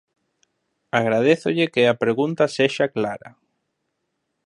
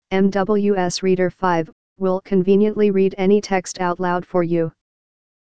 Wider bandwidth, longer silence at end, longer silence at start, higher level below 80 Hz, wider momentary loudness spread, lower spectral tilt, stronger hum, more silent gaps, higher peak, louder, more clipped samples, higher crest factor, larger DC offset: first, 11 kHz vs 9.4 kHz; first, 1.15 s vs 0.65 s; first, 0.95 s vs 0 s; second, -68 dBFS vs -52 dBFS; about the same, 7 LU vs 6 LU; about the same, -5.5 dB/octave vs -6 dB/octave; neither; second, none vs 1.72-1.96 s; about the same, -2 dBFS vs -4 dBFS; about the same, -20 LUFS vs -19 LUFS; neither; about the same, 20 dB vs 16 dB; second, under 0.1% vs 2%